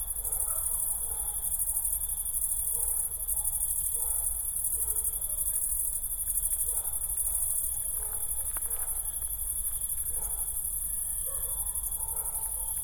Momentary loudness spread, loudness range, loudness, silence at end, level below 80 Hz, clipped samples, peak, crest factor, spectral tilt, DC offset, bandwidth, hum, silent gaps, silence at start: 3 LU; 2 LU; -28 LUFS; 0 s; -44 dBFS; under 0.1%; -12 dBFS; 18 dB; -1 dB/octave; under 0.1%; 19.5 kHz; none; none; 0 s